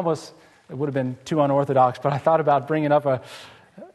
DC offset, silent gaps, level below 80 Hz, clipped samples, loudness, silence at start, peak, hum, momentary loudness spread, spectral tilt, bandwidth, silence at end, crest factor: under 0.1%; none; -66 dBFS; under 0.1%; -22 LUFS; 0 s; -6 dBFS; none; 11 LU; -7.5 dB/octave; 12.5 kHz; 0.1 s; 18 dB